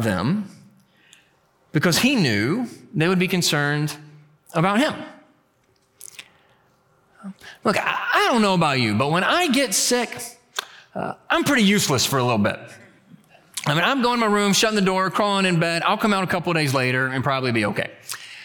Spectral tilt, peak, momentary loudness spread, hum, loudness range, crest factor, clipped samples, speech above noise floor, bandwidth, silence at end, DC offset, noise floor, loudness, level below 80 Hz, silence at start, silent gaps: -4 dB/octave; -6 dBFS; 16 LU; none; 7 LU; 16 dB; under 0.1%; 42 dB; 19 kHz; 0 s; under 0.1%; -63 dBFS; -20 LUFS; -58 dBFS; 0 s; none